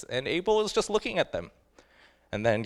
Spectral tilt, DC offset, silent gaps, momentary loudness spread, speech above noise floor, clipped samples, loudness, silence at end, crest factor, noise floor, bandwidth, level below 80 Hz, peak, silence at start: -4.5 dB/octave; under 0.1%; none; 12 LU; 32 dB; under 0.1%; -28 LUFS; 0 s; 18 dB; -61 dBFS; 12.5 kHz; -54 dBFS; -10 dBFS; 0 s